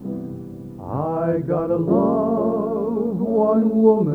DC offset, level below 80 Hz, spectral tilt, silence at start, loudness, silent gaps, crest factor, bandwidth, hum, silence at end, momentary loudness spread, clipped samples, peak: under 0.1%; -52 dBFS; -11.5 dB/octave; 0 s; -20 LUFS; none; 16 dB; 2.9 kHz; none; 0 s; 15 LU; under 0.1%; -2 dBFS